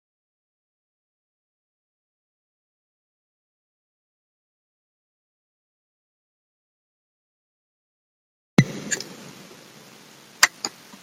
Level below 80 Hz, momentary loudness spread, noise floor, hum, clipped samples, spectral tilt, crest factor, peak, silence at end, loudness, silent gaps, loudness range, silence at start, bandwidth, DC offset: -68 dBFS; 23 LU; -48 dBFS; none; under 0.1%; -3.5 dB/octave; 32 dB; 0 dBFS; 0.35 s; -23 LUFS; none; 4 LU; 8.6 s; 16 kHz; under 0.1%